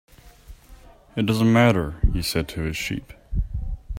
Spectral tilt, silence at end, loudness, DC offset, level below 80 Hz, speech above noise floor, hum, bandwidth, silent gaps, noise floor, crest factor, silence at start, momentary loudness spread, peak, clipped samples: -6 dB/octave; 0 s; -23 LUFS; under 0.1%; -30 dBFS; 27 dB; none; 16 kHz; none; -47 dBFS; 20 dB; 0.25 s; 15 LU; -4 dBFS; under 0.1%